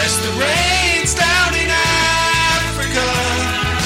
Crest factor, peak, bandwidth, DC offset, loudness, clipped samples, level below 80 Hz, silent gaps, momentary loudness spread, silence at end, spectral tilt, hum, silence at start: 14 dB; -2 dBFS; 16.5 kHz; under 0.1%; -14 LUFS; under 0.1%; -28 dBFS; none; 4 LU; 0 s; -2.5 dB/octave; none; 0 s